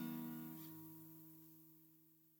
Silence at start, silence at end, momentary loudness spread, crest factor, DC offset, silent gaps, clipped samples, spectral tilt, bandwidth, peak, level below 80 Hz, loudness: 0 s; 0 s; 17 LU; 16 dB; under 0.1%; none; under 0.1%; -6 dB/octave; over 20 kHz; -36 dBFS; under -90 dBFS; -54 LUFS